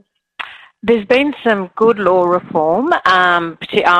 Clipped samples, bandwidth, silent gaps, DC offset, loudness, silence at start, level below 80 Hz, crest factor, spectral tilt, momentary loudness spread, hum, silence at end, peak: under 0.1%; 9.8 kHz; none; under 0.1%; -14 LUFS; 0.4 s; -52 dBFS; 14 dB; -5.5 dB/octave; 15 LU; none; 0 s; 0 dBFS